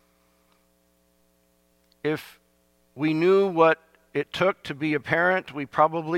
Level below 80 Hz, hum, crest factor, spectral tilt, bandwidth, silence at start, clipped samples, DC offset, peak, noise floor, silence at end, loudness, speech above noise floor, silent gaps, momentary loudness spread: -66 dBFS; 60 Hz at -60 dBFS; 20 dB; -6.5 dB/octave; 14.5 kHz; 2.05 s; under 0.1%; under 0.1%; -6 dBFS; -65 dBFS; 0 s; -24 LUFS; 42 dB; none; 11 LU